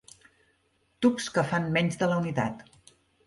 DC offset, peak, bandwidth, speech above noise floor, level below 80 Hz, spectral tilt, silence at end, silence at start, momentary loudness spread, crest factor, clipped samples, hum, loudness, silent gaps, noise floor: under 0.1%; -10 dBFS; 11.5 kHz; 44 dB; -62 dBFS; -5.5 dB/octave; 0.65 s; 1 s; 6 LU; 18 dB; under 0.1%; none; -27 LUFS; none; -70 dBFS